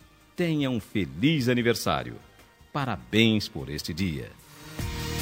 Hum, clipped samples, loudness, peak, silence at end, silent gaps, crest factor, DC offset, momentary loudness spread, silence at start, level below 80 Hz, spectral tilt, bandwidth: none; under 0.1%; -27 LUFS; -6 dBFS; 0 s; none; 22 dB; under 0.1%; 18 LU; 0.4 s; -48 dBFS; -5.5 dB/octave; 16 kHz